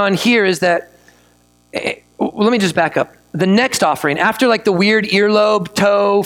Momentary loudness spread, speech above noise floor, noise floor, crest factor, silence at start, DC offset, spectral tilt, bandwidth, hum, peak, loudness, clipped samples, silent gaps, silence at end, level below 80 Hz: 10 LU; 39 dB; -53 dBFS; 14 dB; 0 s; under 0.1%; -4.5 dB/octave; 17.5 kHz; 60 Hz at -40 dBFS; 0 dBFS; -15 LUFS; under 0.1%; none; 0 s; -56 dBFS